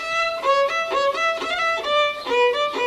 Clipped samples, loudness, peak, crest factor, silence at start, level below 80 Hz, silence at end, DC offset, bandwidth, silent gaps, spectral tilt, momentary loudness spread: under 0.1%; -20 LUFS; -8 dBFS; 12 dB; 0 s; -58 dBFS; 0 s; under 0.1%; 14 kHz; none; -1 dB/octave; 2 LU